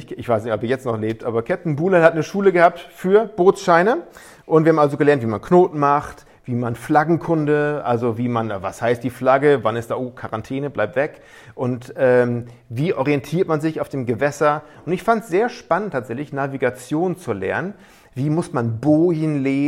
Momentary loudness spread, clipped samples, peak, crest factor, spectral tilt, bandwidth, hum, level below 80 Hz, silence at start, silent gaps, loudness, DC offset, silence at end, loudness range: 11 LU; under 0.1%; 0 dBFS; 18 dB; -7.5 dB/octave; 15.5 kHz; none; -56 dBFS; 0 s; none; -19 LUFS; under 0.1%; 0 s; 5 LU